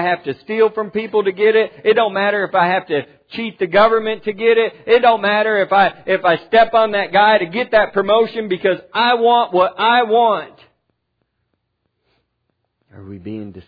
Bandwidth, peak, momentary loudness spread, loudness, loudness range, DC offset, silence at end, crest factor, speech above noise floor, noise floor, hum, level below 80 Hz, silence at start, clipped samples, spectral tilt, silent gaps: 5 kHz; 0 dBFS; 10 LU; -15 LUFS; 4 LU; under 0.1%; 0.05 s; 16 dB; 56 dB; -71 dBFS; none; -56 dBFS; 0 s; under 0.1%; -7 dB/octave; none